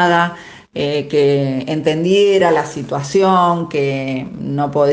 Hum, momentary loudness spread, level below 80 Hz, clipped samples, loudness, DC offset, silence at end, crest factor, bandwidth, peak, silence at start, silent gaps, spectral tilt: none; 11 LU; -54 dBFS; under 0.1%; -16 LUFS; under 0.1%; 0 s; 14 dB; 9.4 kHz; 0 dBFS; 0 s; none; -6 dB/octave